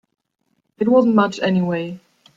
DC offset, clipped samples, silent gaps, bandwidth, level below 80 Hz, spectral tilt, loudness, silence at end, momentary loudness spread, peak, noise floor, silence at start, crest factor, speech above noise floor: under 0.1%; under 0.1%; none; 7.6 kHz; -62 dBFS; -7.5 dB/octave; -18 LUFS; 0.4 s; 15 LU; -4 dBFS; -70 dBFS; 0.8 s; 16 dB; 53 dB